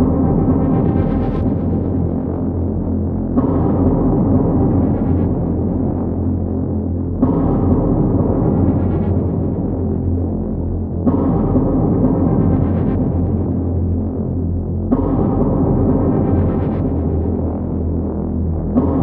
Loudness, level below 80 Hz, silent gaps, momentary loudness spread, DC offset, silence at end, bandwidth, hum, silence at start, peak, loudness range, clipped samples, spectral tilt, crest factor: -17 LUFS; -26 dBFS; none; 5 LU; under 0.1%; 0 s; 2.8 kHz; none; 0 s; -2 dBFS; 1 LU; under 0.1%; -14 dB/octave; 14 dB